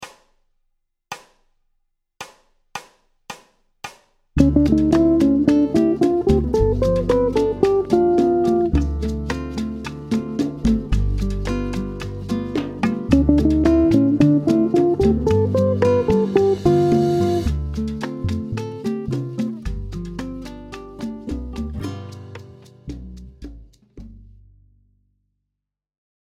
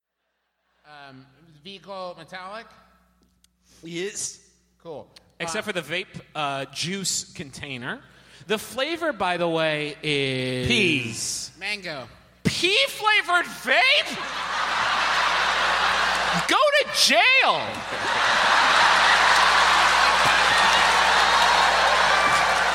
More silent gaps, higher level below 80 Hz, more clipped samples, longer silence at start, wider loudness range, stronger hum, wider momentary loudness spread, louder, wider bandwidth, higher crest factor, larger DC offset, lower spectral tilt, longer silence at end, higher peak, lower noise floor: neither; first, -30 dBFS vs -52 dBFS; neither; second, 0 s vs 0.9 s; second, 16 LU vs 19 LU; neither; first, 21 LU vs 18 LU; about the same, -19 LUFS vs -20 LUFS; second, 13 kHz vs 17 kHz; about the same, 20 dB vs 18 dB; neither; first, -8 dB/octave vs -2 dB/octave; first, 2 s vs 0 s; first, 0 dBFS vs -4 dBFS; first, -83 dBFS vs -77 dBFS